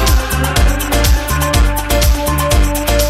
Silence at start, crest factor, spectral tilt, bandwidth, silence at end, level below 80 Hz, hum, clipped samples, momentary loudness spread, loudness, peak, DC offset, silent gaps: 0 s; 12 dB; -4 dB/octave; 16.5 kHz; 0 s; -14 dBFS; none; under 0.1%; 1 LU; -14 LUFS; 0 dBFS; under 0.1%; none